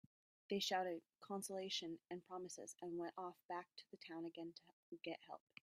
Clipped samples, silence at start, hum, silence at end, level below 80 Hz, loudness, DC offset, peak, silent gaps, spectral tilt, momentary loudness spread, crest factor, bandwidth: under 0.1%; 0.5 s; none; 0.35 s; under -90 dBFS; -49 LUFS; under 0.1%; -28 dBFS; 3.45-3.49 s, 4.73-4.92 s; -3 dB/octave; 15 LU; 20 dB; 14 kHz